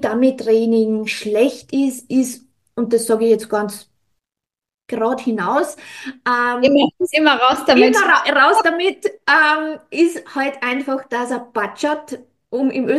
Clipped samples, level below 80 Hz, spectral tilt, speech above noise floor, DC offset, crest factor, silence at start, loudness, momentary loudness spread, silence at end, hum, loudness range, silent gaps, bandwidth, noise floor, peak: under 0.1%; -62 dBFS; -3.5 dB/octave; 70 dB; under 0.1%; 16 dB; 0 s; -17 LUFS; 13 LU; 0 s; none; 7 LU; 4.74-4.78 s; 12.5 kHz; -87 dBFS; 0 dBFS